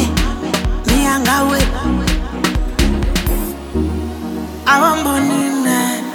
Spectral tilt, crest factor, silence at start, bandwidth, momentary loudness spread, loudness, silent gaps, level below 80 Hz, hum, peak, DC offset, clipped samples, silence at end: -4.5 dB/octave; 14 dB; 0 s; 19 kHz; 8 LU; -16 LUFS; none; -22 dBFS; none; 0 dBFS; under 0.1%; under 0.1%; 0 s